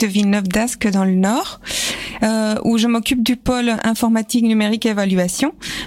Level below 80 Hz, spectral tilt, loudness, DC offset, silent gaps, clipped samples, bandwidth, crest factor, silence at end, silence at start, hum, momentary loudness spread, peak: -42 dBFS; -4.5 dB/octave; -17 LUFS; under 0.1%; none; under 0.1%; 16.5 kHz; 12 dB; 0 s; 0 s; none; 5 LU; -4 dBFS